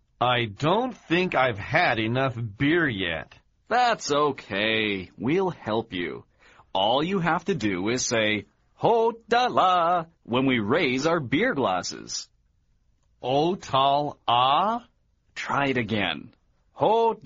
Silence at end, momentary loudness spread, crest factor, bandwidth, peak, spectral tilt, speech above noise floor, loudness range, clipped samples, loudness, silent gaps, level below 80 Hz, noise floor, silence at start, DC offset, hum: 0.1 s; 8 LU; 18 dB; 7.4 kHz; -6 dBFS; -3 dB/octave; 42 dB; 3 LU; under 0.1%; -24 LUFS; none; -58 dBFS; -66 dBFS; 0.2 s; under 0.1%; none